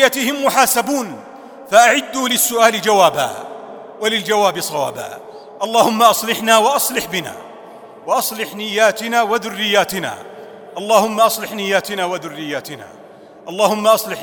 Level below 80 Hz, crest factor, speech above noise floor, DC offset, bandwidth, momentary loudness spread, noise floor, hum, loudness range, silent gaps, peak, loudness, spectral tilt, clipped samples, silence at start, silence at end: -62 dBFS; 16 dB; 24 dB; under 0.1%; over 20 kHz; 20 LU; -40 dBFS; none; 4 LU; none; 0 dBFS; -16 LUFS; -2 dB/octave; under 0.1%; 0 s; 0 s